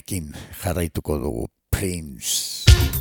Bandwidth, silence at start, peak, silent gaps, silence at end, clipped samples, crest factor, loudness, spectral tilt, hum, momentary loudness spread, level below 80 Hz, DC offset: 19 kHz; 0.1 s; 0 dBFS; none; 0 s; under 0.1%; 22 dB; -23 LUFS; -4 dB/octave; none; 14 LU; -26 dBFS; under 0.1%